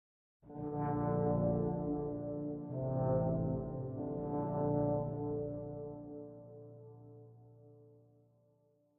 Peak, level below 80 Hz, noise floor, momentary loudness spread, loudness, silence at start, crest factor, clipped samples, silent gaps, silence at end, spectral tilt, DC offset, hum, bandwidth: -22 dBFS; -58 dBFS; -73 dBFS; 20 LU; -37 LUFS; 0.45 s; 16 dB; under 0.1%; none; 1.05 s; -13.5 dB/octave; under 0.1%; none; 2.5 kHz